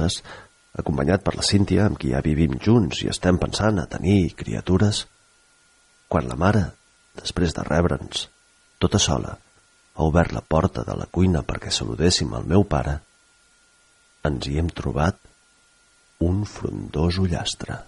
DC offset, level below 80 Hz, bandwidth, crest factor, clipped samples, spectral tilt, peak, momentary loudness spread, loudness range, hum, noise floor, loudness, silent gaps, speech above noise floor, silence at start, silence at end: under 0.1%; -36 dBFS; 11.5 kHz; 18 dB; under 0.1%; -5.5 dB/octave; -4 dBFS; 10 LU; 6 LU; none; -59 dBFS; -23 LUFS; none; 37 dB; 0 s; 0.05 s